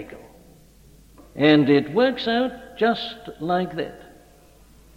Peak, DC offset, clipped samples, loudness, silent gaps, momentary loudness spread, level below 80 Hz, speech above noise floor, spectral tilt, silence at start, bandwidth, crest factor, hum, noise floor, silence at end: -4 dBFS; under 0.1%; under 0.1%; -21 LUFS; none; 16 LU; -54 dBFS; 30 dB; -7 dB/octave; 0 s; 11.5 kHz; 20 dB; none; -51 dBFS; 0.95 s